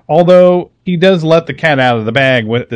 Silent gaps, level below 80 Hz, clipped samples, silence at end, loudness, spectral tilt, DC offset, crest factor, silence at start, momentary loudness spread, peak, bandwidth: none; -50 dBFS; 2%; 0 s; -10 LUFS; -7 dB/octave; under 0.1%; 10 dB; 0.1 s; 7 LU; 0 dBFS; 9.2 kHz